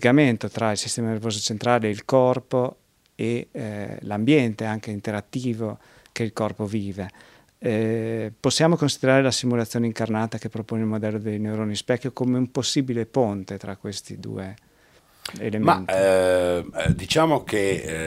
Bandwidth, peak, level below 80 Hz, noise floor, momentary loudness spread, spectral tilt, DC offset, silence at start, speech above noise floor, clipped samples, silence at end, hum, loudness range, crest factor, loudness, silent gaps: 16 kHz; -2 dBFS; -50 dBFS; -57 dBFS; 13 LU; -5 dB/octave; under 0.1%; 0 s; 34 dB; under 0.1%; 0 s; none; 5 LU; 22 dB; -24 LUFS; none